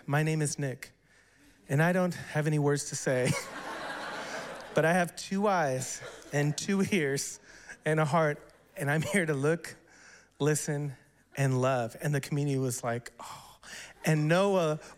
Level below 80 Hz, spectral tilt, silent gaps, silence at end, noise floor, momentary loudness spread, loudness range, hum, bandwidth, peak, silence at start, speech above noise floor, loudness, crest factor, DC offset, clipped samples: -66 dBFS; -5.5 dB/octave; none; 0.05 s; -62 dBFS; 16 LU; 2 LU; none; 16 kHz; -14 dBFS; 0.05 s; 33 dB; -30 LUFS; 18 dB; under 0.1%; under 0.1%